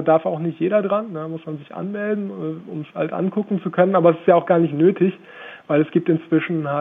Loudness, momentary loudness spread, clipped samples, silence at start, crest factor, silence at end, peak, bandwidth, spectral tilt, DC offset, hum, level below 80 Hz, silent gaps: -20 LUFS; 15 LU; under 0.1%; 0 s; 18 dB; 0 s; -2 dBFS; 3.8 kHz; -10.5 dB/octave; under 0.1%; none; -72 dBFS; none